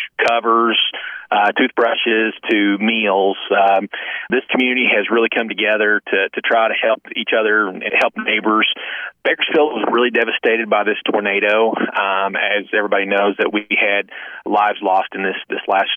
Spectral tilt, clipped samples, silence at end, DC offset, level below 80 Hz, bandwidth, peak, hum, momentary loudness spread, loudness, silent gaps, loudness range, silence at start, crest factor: -5 dB/octave; under 0.1%; 0 s; under 0.1%; -70 dBFS; 9 kHz; -4 dBFS; none; 6 LU; -16 LUFS; none; 1 LU; 0 s; 12 dB